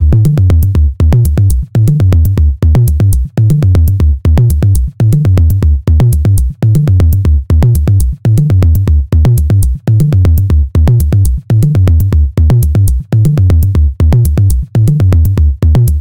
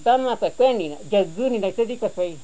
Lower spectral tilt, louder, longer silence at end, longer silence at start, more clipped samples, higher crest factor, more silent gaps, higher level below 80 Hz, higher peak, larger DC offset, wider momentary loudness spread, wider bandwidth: first, -8 dB/octave vs -5.5 dB/octave; first, -9 LUFS vs -22 LUFS; about the same, 0 s vs 0.05 s; about the same, 0 s vs 0 s; neither; second, 6 dB vs 14 dB; neither; first, -12 dBFS vs -58 dBFS; first, 0 dBFS vs -8 dBFS; second, under 0.1% vs 1%; second, 3 LU vs 6 LU; first, 17 kHz vs 8 kHz